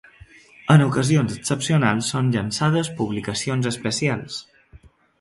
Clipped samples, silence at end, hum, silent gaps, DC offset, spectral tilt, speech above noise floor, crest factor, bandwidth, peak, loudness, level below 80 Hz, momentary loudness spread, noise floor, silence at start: under 0.1%; 0.45 s; none; none; under 0.1%; -5.5 dB/octave; 30 dB; 20 dB; 11.5 kHz; -2 dBFS; -21 LUFS; -52 dBFS; 9 LU; -50 dBFS; 0.65 s